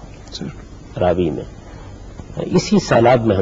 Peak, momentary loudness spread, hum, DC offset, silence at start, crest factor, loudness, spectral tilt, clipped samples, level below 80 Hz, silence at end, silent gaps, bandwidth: -2 dBFS; 24 LU; none; under 0.1%; 0 s; 16 dB; -16 LUFS; -6.5 dB/octave; under 0.1%; -38 dBFS; 0 s; none; 7.8 kHz